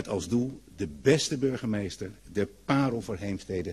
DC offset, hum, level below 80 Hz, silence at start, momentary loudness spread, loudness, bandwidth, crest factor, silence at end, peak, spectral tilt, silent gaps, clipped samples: under 0.1%; none; -54 dBFS; 0 s; 11 LU; -29 LUFS; 13 kHz; 20 dB; 0 s; -10 dBFS; -5.5 dB/octave; none; under 0.1%